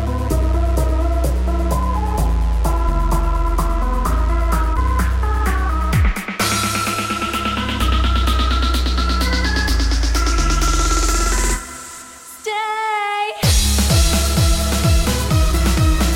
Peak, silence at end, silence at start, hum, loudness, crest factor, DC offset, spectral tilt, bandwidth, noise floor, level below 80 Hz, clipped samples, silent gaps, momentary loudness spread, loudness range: -2 dBFS; 0 s; 0 s; none; -18 LUFS; 14 dB; under 0.1%; -4 dB/octave; 17 kHz; -36 dBFS; -18 dBFS; under 0.1%; none; 4 LU; 3 LU